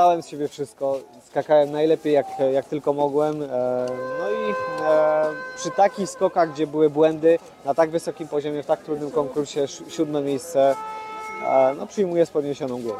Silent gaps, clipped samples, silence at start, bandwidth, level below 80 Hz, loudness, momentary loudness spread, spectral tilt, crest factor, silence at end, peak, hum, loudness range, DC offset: none; under 0.1%; 0 s; 14.5 kHz; -66 dBFS; -23 LUFS; 9 LU; -5.5 dB/octave; 16 dB; 0 s; -6 dBFS; none; 4 LU; under 0.1%